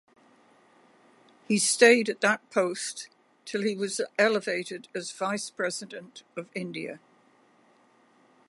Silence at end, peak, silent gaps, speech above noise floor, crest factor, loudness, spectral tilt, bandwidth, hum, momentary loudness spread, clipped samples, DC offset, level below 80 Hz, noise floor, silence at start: 1.5 s; -4 dBFS; none; 35 dB; 24 dB; -27 LUFS; -3 dB/octave; 11.5 kHz; none; 22 LU; under 0.1%; under 0.1%; -82 dBFS; -62 dBFS; 1.5 s